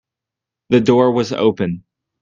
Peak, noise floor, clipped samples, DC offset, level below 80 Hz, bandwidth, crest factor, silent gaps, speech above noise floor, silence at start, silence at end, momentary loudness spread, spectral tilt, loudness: 0 dBFS; -85 dBFS; under 0.1%; under 0.1%; -54 dBFS; 7.6 kHz; 16 dB; none; 70 dB; 0.7 s; 0.4 s; 10 LU; -7 dB/octave; -16 LUFS